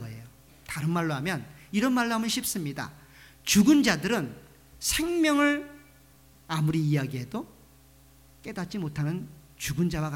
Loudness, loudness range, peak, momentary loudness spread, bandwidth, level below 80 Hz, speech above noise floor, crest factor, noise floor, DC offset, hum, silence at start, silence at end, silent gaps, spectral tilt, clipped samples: -27 LUFS; 7 LU; -10 dBFS; 17 LU; 19 kHz; -52 dBFS; 30 dB; 18 dB; -56 dBFS; under 0.1%; none; 0 s; 0 s; none; -4.5 dB/octave; under 0.1%